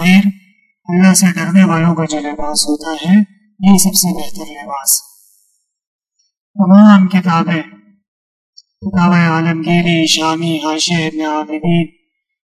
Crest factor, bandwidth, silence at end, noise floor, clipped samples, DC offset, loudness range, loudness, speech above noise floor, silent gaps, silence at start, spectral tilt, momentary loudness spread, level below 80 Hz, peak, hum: 12 dB; 15 kHz; 0.6 s; -60 dBFS; under 0.1%; under 0.1%; 3 LU; -12 LUFS; 49 dB; 5.87-5.99 s, 6.40-6.54 s, 8.08-8.53 s; 0 s; -4.5 dB/octave; 11 LU; -48 dBFS; 0 dBFS; none